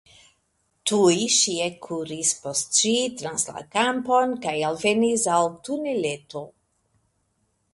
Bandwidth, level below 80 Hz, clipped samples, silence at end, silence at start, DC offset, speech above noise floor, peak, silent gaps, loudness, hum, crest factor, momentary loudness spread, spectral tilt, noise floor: 11.5 kHz; -66 dBFS; under 0.1%; 1.25 s; 0.85 s; under 0.1%; 47 dB; -6 dBFS; none; -23 LUFS; none; 18 dB; 10 LU; -2.5 dB/octave; -71 dBFS